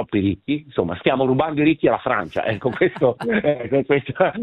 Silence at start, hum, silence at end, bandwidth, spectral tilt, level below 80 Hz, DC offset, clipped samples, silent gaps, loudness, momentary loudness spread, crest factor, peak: 0 s; none; 0 s; 9.4 kHz; -8.5 dB/octave; -52 dBFS; under 0.1%; under 0.1%; none; -20 LUFS; 5 LU; 18 dB; -2 dBFS